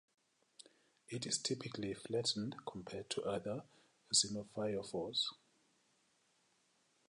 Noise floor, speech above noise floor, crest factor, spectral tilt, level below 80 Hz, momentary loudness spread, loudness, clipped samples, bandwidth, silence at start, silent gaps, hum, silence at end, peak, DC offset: -77 dBFS; 36 dB; 24 dB; -3 dB/octave; -76 dBFS; 14 LU; -40 LUFS; under 0.1%; 11 kHz; 1.1 s; none; none; 1.75 s; -20 dBFS; under 0.1%